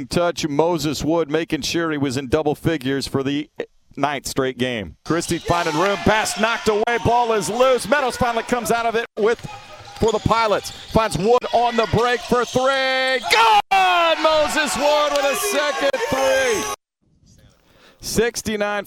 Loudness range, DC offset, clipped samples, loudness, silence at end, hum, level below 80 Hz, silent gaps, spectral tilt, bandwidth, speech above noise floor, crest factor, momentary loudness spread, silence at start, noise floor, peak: 6 LU; under 0.1%; under 0.1%; -19 LUFS; 0 s; none; -42 dBFS; none; -4 dB/octave; 17.5 kHz; 42 dB; 20 dB; 8 LU; 0 s; -61 dBFS; 0 dBFS